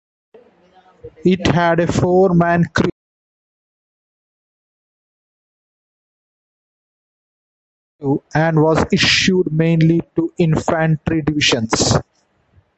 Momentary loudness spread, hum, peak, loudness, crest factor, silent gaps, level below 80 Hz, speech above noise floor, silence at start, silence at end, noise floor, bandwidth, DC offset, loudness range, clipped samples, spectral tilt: 7 LU; none; -2 dBFS; -16 LUFS; 18 dB; 2.92-7.99 s; -40 dBFS; 41 dB; 1.05 s; 0.75 s; -56 dBFS; 8.2 kHz; under 0.1%; 10 LU; under 0.1%; -5 dB/octave